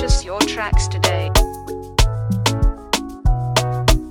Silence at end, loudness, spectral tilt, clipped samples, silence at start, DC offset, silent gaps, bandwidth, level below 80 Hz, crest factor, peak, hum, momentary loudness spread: 0 s; -19 LUFS; -4 dB/octave; under 0.1%; 0 s; under 0.1%; none; 18 kHz; -20 dBFS; 16 dB; 0 dBFS; none; 5 LU